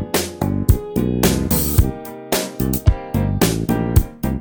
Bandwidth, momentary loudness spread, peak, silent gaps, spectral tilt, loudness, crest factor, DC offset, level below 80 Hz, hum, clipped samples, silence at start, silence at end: over 20 kHz; 6 LU; 0 dBFS; none; -5.5 dB/octave; -19 LUFS; 18 dB; under 0.1%; -24 dBFS; none; under 0.1%; 0 s; 0 s